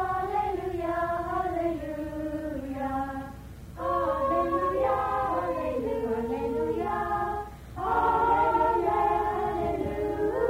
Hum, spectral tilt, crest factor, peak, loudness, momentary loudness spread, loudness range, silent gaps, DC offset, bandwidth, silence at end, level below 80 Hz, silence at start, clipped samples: none; -7.5 dB/octave; 14 dB; -14 dBFS; -28 LUFS; 11 LU; 5 LU; none; under 0.1%; 16 kHz; 0 s; -46 dBFS; 0 s; under 0.1%